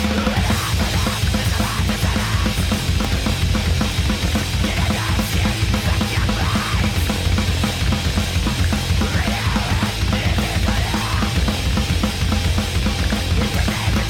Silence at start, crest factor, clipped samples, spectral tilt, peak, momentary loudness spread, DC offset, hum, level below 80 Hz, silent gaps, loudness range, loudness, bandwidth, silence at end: 0 s; 14 dB; under 0.1%; -4.5 dB/octave; -6 dBFS; 1 LU; under 0.1%; none; -24 dBFS; none; 0 LU; -19 LUFS; 17.5 kHz; 0 s